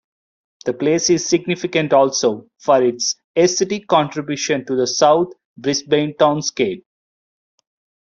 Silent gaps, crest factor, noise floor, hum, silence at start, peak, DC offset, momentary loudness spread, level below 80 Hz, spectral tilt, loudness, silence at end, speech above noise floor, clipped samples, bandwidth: 3.24-3.34 s, 5.45-5.56 s; 16 dB; under -90 dBFS; none; 0.65 s; -2 dBFS; under 0.1%; 8 LU; -62 dBFS; -3.5 dB/octave; -18 LUFS; 1.25 s; over 73 dB; under 0.1%; 7.8 kHz